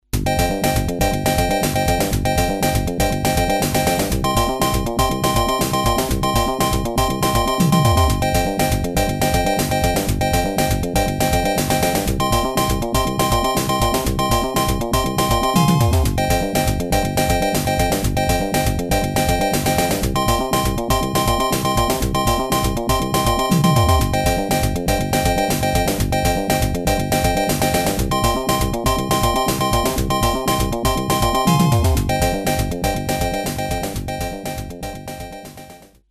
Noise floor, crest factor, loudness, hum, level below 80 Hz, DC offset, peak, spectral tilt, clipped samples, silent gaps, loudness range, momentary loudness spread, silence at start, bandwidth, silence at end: -42 dBFS; 16 dB; -18 LUFS; none; -26 dBFS; under 0.1%; -2 dBFS; -4.5 dB/octave; under 0.1%; none; 1 LU; 4 LU; 0.15 s; 14.5 kHz; 0.35 s